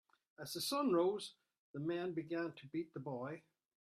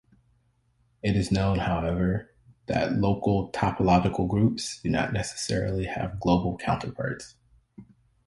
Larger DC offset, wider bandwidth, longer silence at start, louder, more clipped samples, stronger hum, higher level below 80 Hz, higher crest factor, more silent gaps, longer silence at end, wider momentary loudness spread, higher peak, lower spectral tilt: neither; first, 15.5 kHz vs 11.5 kHz; second, 0.4 s vs 1.05 s; second, -41 LUFS vs -27 LUFS; neither; neither; second, -84 dBFS vs -44 dBFS; about the same, 18 dB vs 18 dB; first, 1.58-1.74 s vs none; about the same, 0.45 s vs 0.45 s; first, 16 LU vs 9 LU; second, -24 dBFS vs -8 dBFS; about the same, -5 dB/octave vs -6 dB/octave